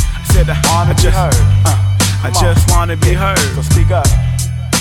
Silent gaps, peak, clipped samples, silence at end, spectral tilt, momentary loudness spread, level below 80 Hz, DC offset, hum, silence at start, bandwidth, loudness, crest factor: none; 0 dBFS; under 0.1%; 0 s; -4.5 dB/octave; 3 LU; -16 dBFS; under 0.1%; none; 0 s; 17.5 kHz; -12 LUFS; 10 dB